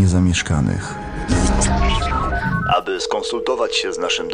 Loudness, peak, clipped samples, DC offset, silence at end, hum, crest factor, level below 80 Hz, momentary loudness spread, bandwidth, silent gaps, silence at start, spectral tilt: -19 LUFS; -4 dBFS; under 0.1%; under 0.1%; 0 s; none; 14 dB; -26 dBFS; 5 LU; 10.5 kHz; none; 0 s; -4.5 dB/octave